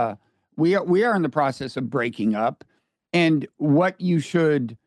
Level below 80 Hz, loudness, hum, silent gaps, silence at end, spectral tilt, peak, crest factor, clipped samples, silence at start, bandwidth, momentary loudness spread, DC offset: -68 dBFS; -22 LUFS; none; none; 0.1 s; -7 dB/octave; -8 dBFS; 14 dB; under 0.1%; 0 s; 11 kHz; 7 LU; under 0.1%